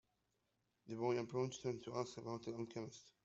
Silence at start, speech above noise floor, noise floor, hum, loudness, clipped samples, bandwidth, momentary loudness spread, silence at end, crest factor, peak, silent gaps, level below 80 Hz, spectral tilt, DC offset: 0.85 s; 41 dB; -85 dBFS; none; -45 LUFS; under 0.1%; 8 kHz; 10 LU; 0.15 s; 20 dB; -26 dBFS; none; -80 dBFS; -6 dB/octave; under 0.1%